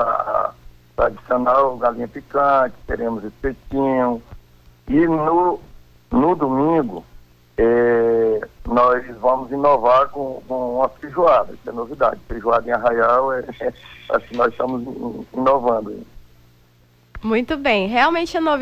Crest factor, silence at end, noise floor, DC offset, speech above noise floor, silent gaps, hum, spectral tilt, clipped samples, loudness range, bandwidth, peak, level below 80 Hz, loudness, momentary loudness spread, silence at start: 14 dB; 0 s; -54 dBFS; under 0.1%; 35 dB; none; 60 Hz at -50 dBFS; -7 dB/octave; under 0.1%; 4 LU; 14.5 kHz; -6 dBFS; -42 dBFS; -19 LUFS; 13 LU; 0 s